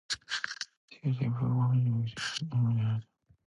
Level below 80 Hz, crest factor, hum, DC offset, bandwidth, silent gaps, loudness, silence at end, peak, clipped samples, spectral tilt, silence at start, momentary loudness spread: -64 dBFS; 14 dB; none; under 0.1%; 11 kHz; 0.77-0.88 s; -32 LUFS; 0.45 s; -16 dBFS; under 0.1%; -5.5 dB/octave; 0.1 s; 10 LU